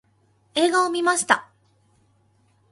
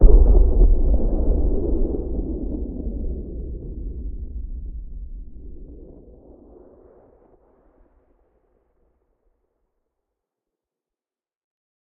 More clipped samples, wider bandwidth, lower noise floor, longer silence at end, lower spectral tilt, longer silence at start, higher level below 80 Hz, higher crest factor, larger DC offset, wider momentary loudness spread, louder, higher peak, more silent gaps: neither; first, 11.5 kHz vs 1.3 kHz; second, -63 dBFS vs under -90 dBFS; second, 1.3 s vs 6.15 s; second, -1.5 dB/octave vs -15.5 dB/octave; first, 0.55 s vs 0 s; second, -72 dBFS vs -22 dBFS; about the same, 24 dB vs 20 dB; neither; second, 3 LU vs 25 LU; first, -21 LUFS vs -24 LUFS; about the same, 0 dBFS vs 0 dBFS; neither